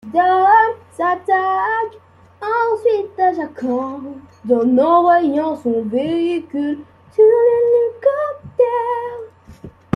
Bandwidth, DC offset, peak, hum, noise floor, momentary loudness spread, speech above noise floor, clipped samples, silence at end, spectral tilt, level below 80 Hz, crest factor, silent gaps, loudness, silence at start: 10.5 kHz; under 0.1%; -2 dBFS; none; -39 dBFS; 13 LU; 23 dB; under 0.1%; 0.25 s; -7.5 dB/octave; -60 dBFS; 14 dB; none; -16 LUFS; 0.05 s